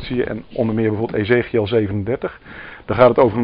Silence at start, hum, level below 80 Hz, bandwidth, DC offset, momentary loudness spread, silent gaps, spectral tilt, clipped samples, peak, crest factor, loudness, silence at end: 0 s; none; -44 dBFS; 5.2 kHz; under 0.1%; 16 LU; none; -6 dB/octave; under 0.1%; 0 dBFS; 18 dB; -18 LUFS; 0 s